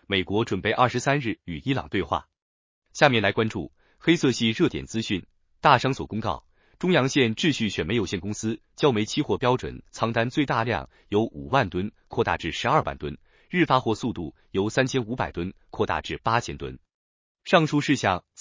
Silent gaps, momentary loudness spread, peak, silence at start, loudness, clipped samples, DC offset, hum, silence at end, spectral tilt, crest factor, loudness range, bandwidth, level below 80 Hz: 2.42-2.82 s, 16.94-17.35 s; 11 LU; -2 dBFS; 0.1 s; -25 LUFS; under 0.1%; under 0.1%; none; 0.2 s; -5.5 dB/octave; 24 dB; 2 LU; 7.6 kHz; -48 dBFS